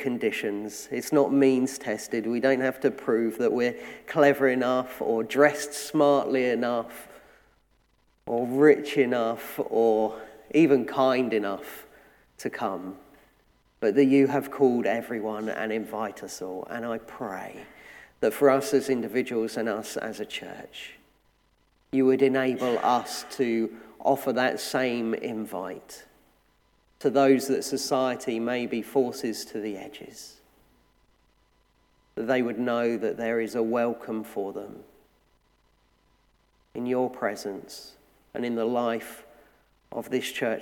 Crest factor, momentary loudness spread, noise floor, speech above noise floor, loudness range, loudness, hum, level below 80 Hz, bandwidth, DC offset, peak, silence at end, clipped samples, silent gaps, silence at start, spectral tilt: 22 dB; 18 LU; -66 dBFS; 41 dB; 9 LU; -26 LUFS; none; -68 dBFS; 18.5 kHz; under 0.1%; -4 dBFS; 0 s; under 0.1%; none; 0 s; -5 dB/octave